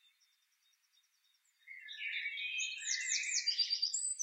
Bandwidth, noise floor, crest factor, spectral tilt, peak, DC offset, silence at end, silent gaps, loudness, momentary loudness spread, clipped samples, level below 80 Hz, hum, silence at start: 16 kHz; -76 dBFS; 18 dB; 12 dB/octave; -22 dBFS; under 0.1%; 0 s; none; -35 LUFS; 14 LU; under 0.1%; under -90 dBFS; none; 1.65 s